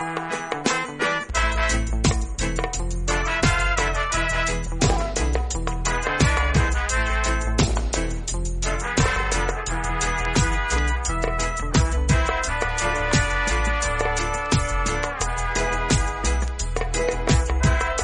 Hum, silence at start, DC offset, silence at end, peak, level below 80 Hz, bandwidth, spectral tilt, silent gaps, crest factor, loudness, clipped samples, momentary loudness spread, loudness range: none; 0 s; under 0.1%; 0 s; -4 dBFS; -26 dBFS; 11 kHz; -4 dB/octave; none; 16 dB; -23 LUFS; under 0.1%; 5 LU; 1 LU